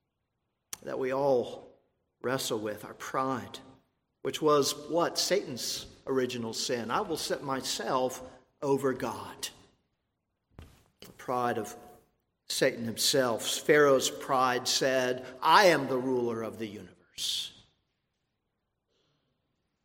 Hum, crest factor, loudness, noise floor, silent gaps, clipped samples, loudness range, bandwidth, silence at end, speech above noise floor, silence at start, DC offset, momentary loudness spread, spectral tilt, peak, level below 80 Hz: none; 24 dB; -29 LUFS; -82 dBFS; none; under 0.1%; 11 LU; 16.5 kHz; 2.35 s; 53 dB; 0.85 s; under 0.1%; 16 LU; -3 dB/octave; -6 dBFS; -68 dBFS